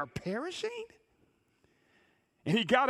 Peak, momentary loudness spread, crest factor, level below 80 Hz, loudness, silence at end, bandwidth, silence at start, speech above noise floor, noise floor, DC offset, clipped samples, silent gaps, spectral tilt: -12 dBFS; 15 LU; 22 dB; -66 dBFS; -34 LUFS; 0 s; 13.5 kHz; 0 s; 40 dB; -71 dBFS; under 0.1%; under 0.1%; none; -5 dB/octave